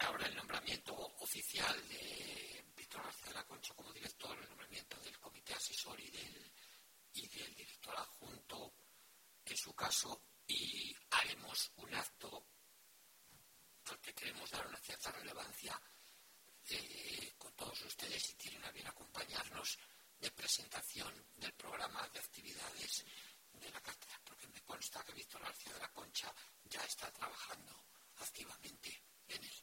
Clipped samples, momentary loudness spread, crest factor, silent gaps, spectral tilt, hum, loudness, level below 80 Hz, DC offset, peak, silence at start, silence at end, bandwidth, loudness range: under 0.1%; 18 LU; 28 dB; none; -0.5 dB/octave; none; -46 LUFS; -76 dBFS; under 0.1%; -22 dBFS; 0 s; 0 s; 16.5 kHz; 8 LU